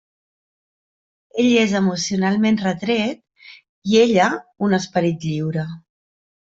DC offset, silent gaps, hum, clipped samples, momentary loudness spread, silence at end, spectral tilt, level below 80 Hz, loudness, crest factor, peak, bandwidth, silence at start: under 0.1%; 3.69-3.82 s; none; under 0.1%; 13 LU; 0.75 s; -5.5 dB/octave; -60 dBFS; -19 LUFS; 18 dB; -2 dBFS; 7.8 kHz; 1.35 s